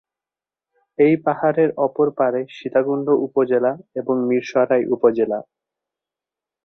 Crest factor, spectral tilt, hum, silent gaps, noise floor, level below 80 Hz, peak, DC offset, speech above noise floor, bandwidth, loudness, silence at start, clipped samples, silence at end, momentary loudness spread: 18 dB; -8 dB/octave; none; none; under -90 dBFS; -66 dBFS; -2 dBFS; under 0.1%; over 72 dB; 6.6 kHz; -19 LUFS; 1 s; under 0.1%; 1.25 s; 6 LU